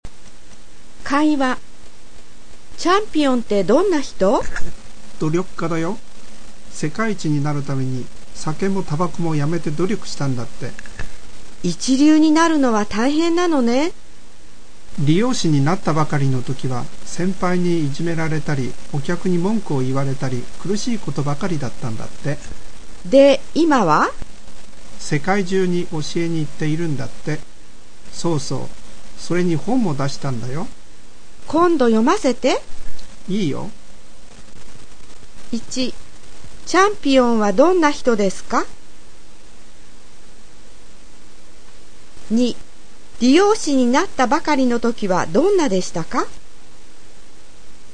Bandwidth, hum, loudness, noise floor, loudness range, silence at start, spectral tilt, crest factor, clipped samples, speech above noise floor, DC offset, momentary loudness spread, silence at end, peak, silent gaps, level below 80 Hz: 9.8 kHz; none; -19 LUFS; -46 dBFS; 7 LU; 0 s; -5.5 dB/octave; 20 dB; under 0.1%; 27 dB; 8%; 15 LU; 0 s; 0 dBFS; none; -42 dBFS